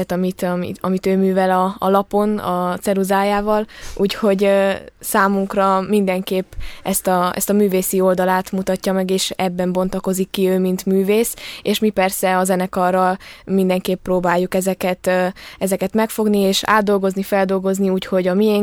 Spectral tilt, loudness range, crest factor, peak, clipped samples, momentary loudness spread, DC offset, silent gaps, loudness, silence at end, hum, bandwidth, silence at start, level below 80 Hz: -5 dB/octave; 1 LU; 16 dB; -2 dBFS; under 0.1%; 6 LU; under 0.1%; none; -18 LUFS; 0 s; none; 18 kHz; 0 s; -44 dBFS